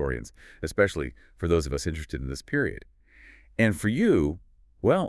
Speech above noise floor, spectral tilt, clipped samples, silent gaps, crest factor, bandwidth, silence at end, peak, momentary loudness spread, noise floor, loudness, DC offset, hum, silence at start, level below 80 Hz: 27 dB; -6 dB/octave; under 0.1%; none; 18 dB; 12 kHz; 0 s; -8 dBFS; 15 LU; -53 dBFS; -27 LUFS; under 0.1%; none; 0 s; -42 dBFS